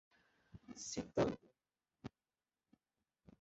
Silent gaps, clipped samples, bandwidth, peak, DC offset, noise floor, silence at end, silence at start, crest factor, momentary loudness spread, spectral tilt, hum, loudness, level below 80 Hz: none; under 0.1%; 7.6 kHz; -24 dBFS; under 0.1%; under -90 dBFS; 1.35 s; 0.55 s; 22 dB; 21 LU; -5.5 dB/octave; none; -42 LUFS; -70 dBFS